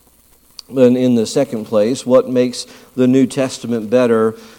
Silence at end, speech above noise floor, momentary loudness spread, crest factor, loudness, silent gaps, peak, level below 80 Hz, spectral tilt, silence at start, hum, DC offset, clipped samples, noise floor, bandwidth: 0.1 s; 36 dB; 8 LU; 14 dB; -15 LUFS; none; 0 dBFS; -60 dBFS; -6 dB/octave; 0.7 s; none; under 0.1%; under 0.1%; -51 dBFS; 16 kHz